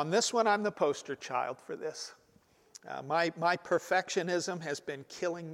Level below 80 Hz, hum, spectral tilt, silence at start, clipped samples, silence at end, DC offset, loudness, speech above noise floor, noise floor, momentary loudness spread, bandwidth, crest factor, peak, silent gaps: -82 dBFS; none; -3.5 dB/octave; 0 s; under 0.1%; 0 s; under 0.1%; -32 LUFS; 33 dB; -66 dBFS; 14 LU; 16 kHz; 18 dB; -14 dBFS; none